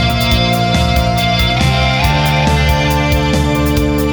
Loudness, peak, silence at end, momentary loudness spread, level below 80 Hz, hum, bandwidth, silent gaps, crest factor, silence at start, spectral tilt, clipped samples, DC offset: -13 LUFS; 0 dBFS; 0 s; 1 LU; -20 dBFS; none; over 20 kHz; none; 12 dB; 0 s; -5.5 dB/octave; under 0.1%; under 0.1%